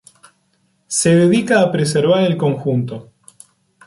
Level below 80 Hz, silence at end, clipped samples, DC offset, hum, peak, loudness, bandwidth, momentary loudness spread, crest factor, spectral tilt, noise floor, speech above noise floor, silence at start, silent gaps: -58 dBFS; 0.85 s; under 0.1%; under 0.1%; none; -2 dBFS; -15 LUFS; 11.5 kHz; 9 LU; 14 dB; -5.5 dB/octave; -62 dBFS; 48 dB; 0.9 s; none